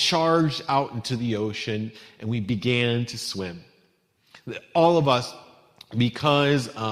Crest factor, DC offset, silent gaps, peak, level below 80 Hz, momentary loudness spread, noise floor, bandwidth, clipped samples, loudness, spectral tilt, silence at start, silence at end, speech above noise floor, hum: 18 dB; under 0.1%; none; -6 dBFS; -60 dBFS; 16 LU; -65 dBFS; 15 kHz; under 0.1%; -24 LUFS; -5.5 dB/octave; 0 s; 0 s; 41 dB; none